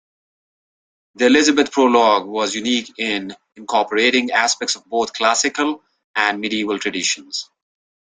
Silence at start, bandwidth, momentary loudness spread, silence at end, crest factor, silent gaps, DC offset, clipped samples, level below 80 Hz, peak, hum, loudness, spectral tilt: 1.2 s; 9.8 kHz; 11 LU; 0.7 s; 18 dB; 6.04-6.14 s; under 0.1%; under 0.1%; -62 dBFS; 0 dBFS; none; -18 LUFS; -1.5 dB/octave